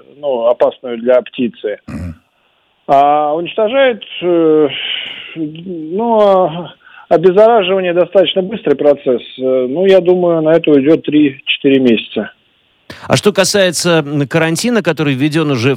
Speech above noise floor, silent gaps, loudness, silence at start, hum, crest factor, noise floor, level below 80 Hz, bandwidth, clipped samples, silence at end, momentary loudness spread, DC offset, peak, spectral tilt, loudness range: 45 dB; none; -12 LUFS; 0.2 s; none; 12 dB; -57 dBFS; -50 dBFS; 16.5 kHz; 0.2%; 0 s; 13 LU; under 0.1%; 0 dBFS; -5 dB/octave; 3 LU